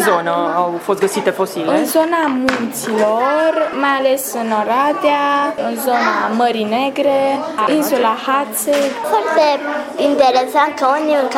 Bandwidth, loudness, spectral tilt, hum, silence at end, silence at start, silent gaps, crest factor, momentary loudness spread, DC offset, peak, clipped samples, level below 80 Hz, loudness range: 17.5 kHz; -15 LUFS; -3.5 dB/octave; none; 0 s; 0 s; none; 12 dB; 4 LU; under 0.1%; -2 dBFS; under 0.1%; -60 dBFS; 1 LU